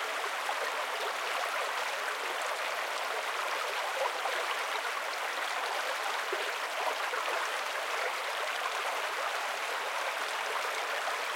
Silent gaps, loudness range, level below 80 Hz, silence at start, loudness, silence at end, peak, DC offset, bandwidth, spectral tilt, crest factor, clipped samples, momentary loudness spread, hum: none; 0 LU; under -90 dBFS; 0 s; -33 LUFS; 0 s; -18 dBFS; under 0.1%; 16.5 kHz; 2 dB/octave; 16 dB; under 0.1%; 1 LU; none